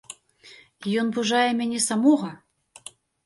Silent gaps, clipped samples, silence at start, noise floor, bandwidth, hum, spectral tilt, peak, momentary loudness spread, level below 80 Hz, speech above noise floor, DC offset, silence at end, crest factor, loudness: none; under 0.1%; 0.1 s; -51 dBFS; 11.5 kHz; none; -3.5 dB/octave; -8 dBFS; 23 LU; -72 dBFS; 29 dB; under 0.1%; 0.9 s; 18 dB; -23 LUFS